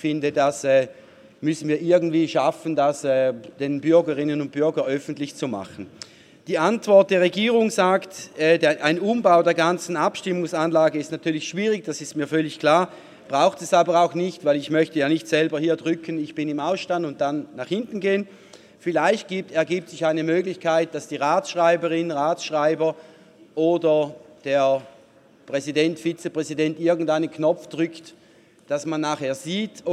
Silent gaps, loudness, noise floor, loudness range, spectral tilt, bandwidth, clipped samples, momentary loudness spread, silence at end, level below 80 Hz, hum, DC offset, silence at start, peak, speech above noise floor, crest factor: none; -22 LUFS; -53 dBFS; 5 LU; -5 dB/octave; 13 kHz; under 0.1%; 10 LU; 0 s; -72 dBFS; none; under 0.1%; 0 s; -2 dBFS; 32 dB; 20 dB